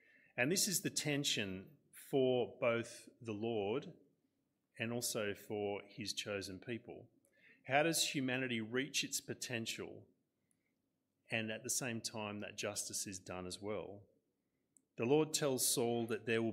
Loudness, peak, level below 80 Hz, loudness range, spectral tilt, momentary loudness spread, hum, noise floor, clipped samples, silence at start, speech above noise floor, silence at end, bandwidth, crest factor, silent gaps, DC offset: -39 LUFS; -18 dBFS; -82 dBFS; 5 LU; -3 dB/octave; 14 LU; none; -86 dBFS; under 0.1%; 0.35 s; 46 dB; 0 s; 16 kHz; 22 dB; none; under 0.1%